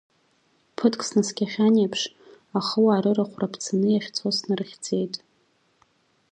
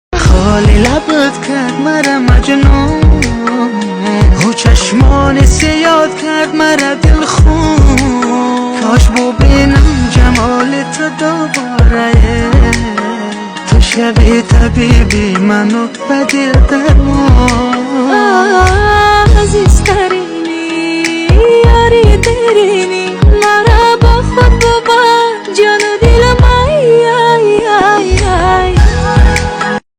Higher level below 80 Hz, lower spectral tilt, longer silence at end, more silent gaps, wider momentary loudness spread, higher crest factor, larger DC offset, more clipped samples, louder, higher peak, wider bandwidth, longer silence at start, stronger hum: second, -72 dBFS vs -12 dBFS; about the same, -5 dB/octave vs -5.5 dB/octave; first, 1.15 s vs 0.2 s; neither; first, 10 LU vs 6 LU; first, 20 dB vs 8 dB; neither; second, under 0.1% vs 3%; second, -24 LUFS vs -9 LUFS; second, -6 dBFS vs 0 dBFS; about the same, 9.8 kHz vs 10.5 kHz; first, 0.8 s vs 0.1 s; neither